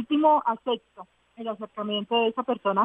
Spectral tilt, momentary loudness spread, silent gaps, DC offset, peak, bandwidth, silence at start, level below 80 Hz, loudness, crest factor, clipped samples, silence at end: -7.5 dB/octave; 14 LU; none; under 0.1%; -10 dBFS; 3.8 kHz; 0 s; -76 dBFS; -26 LUFS; 16 dB; under 0.1%; 0 s